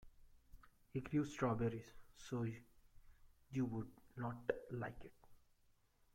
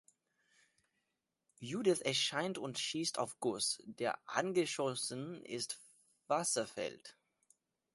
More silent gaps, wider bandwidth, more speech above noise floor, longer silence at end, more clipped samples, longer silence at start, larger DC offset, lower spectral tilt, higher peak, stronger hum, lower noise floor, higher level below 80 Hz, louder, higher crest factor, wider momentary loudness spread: neither; first, 16 kHz vs 12 kHz; second, 32 dB vs 49 dB; about the same, 0.8 s vs 0.85 s; neither; second, 0 s vs 1.6 s; neither; first, -7.5 dB/octave vs -3 dB/octave; second, -24 dBFS vs -16 dBFS; neither; second, -75 dBFS vs -87 dBFS; first, -66 dBFS vs -82 dBFS; second, -45 LUFS vs -37 LUFS; about the same, 22 dB vs 24 dB; first, 19 LU vs 11 LU